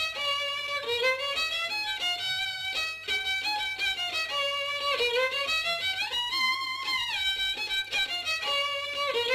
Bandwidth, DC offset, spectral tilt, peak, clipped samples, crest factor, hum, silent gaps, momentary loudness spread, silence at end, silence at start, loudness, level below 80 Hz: 14 kHz; under 0.1%; 0.5 dB/octave; -16 dBFS; under 0.1%; 14 dB; none; none; 3 LU; 0 s; 0 s; -27 LUFS; -62 dBFS